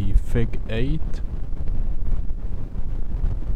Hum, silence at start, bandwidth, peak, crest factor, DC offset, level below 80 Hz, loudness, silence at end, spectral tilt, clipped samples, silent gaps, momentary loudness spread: none; 0 s; 4.1 kHz; -4 dBFS; 14 dB; under 0.1%; -22 dBFS; -29 LUFS; 0 s; -8 dB/octave; under 0.1%; none; 8 LU